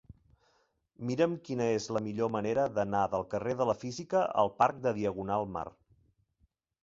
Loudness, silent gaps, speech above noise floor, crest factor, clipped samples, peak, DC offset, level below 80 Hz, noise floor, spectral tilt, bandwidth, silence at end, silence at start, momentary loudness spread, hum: -32 LUFS; none; 43 dB; 20 dB; under 0.1%; -12 dBFS; under 0.1%; -64 dBFS; -74 dBFS; -6 dB/octave; 7.8 kHz; 1.15 s; 0.1 s; 8 LU; none